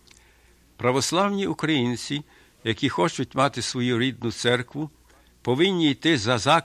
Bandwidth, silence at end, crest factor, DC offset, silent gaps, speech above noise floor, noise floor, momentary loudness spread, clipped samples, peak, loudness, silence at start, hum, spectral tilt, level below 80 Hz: 14.5 kHz; 0 s; 20 dB; under 0.1%; none; 34 dB; -57 dBFS; 11 LU; under 0.1%; -4 dBFS; -24 LUFS; 0.8 s; none; -4.5 dB/octave; -56 dBFS